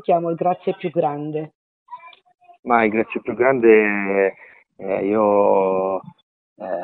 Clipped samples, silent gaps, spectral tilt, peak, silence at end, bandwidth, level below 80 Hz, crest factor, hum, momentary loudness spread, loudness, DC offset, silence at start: under 0.1%; 1.55-1.86 s, 2.59-2.63 s, 6.23-6.56 s; -11 dB/octave; -2 dBFS; 0 s; 4.1 kHz; -62 dBFS; 18 dB; none; 20 LU; -19 LUFS; under 0.1%; 0.1 s